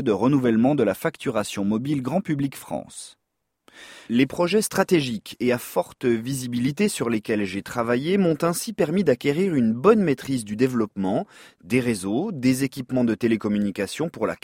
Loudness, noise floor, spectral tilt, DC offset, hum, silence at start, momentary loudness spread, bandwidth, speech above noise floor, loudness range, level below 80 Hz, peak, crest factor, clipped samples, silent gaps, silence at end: -23 LUFS; -61 dBFS; -5.5 dB/octave; under 0.1%; none; 0 s; 8 LU; 16.5 kHz; 39 dB; 4 LU; -58 dBFS; -4 dBFS; 18 dB; under 0.1%; none; 0.1 s